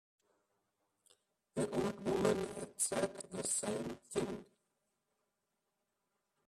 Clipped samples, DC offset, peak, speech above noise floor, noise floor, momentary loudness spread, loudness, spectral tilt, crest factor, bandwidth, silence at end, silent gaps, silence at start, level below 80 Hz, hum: under 0.1%; under 0.1%; -22 dBFS; 47 dB; -86 dBFS; 9 LU; -38 LUFS; -4 dB/octave; 20 dB; 14.5 kHz; 2.05 s; none; 1.55 s; -70 dBFS; none